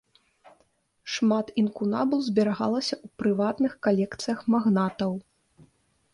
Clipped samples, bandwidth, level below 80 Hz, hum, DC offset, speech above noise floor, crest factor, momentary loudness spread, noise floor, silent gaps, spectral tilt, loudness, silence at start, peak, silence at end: under 0.1%; 11 kHz; -66 dBFS; none; under 0.1%; 43 dB; 16 dB; 7 LU; -68 dBFS; none; -6 dB/octave; -26 LUFS; 1.05 s; -10 dBFS; 0.95 s